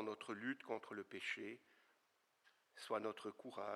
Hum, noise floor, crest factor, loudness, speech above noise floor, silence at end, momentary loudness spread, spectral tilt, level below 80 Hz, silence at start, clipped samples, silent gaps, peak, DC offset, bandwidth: none; -81 dBFS; 20 dB; -48 LUFS; 33 dB; 0 s; 11 LU; -4 dB/octave; under -90 dBFS; 0 s; under 0.1%; none; -28 dBFS; under 0.1%; 14 kHz